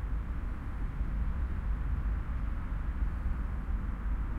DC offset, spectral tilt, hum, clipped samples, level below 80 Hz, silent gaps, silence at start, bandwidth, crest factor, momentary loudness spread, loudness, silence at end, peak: under 0.1%; -9 dB/octave; none; under 0.1%; -34 dBFS; none; 0 s; 3.8 kHz; 12 dB; 4 LU; -37 LUFS; 0 s; -22 dBFS